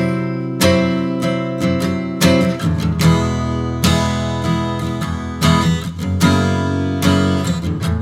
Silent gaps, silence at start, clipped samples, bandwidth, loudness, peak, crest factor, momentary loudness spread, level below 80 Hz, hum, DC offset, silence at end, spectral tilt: none; 0 s; under 0.1%; 17.5 kHz; -17 LUFS; 0 dBFS; 16 dB; 7 LU; -34 dBFS; none; under 0.1%; 0 s; -6 dB/octave